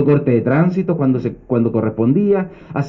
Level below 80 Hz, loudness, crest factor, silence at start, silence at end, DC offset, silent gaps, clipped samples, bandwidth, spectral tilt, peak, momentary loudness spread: -48 dBFS; -17 LUFS; 12 dB; 0 s; 0 s; under 0.1%; none; under 0.1%; 6.2 kHz; -11 dB/octave; -2 dBFS; 5 LU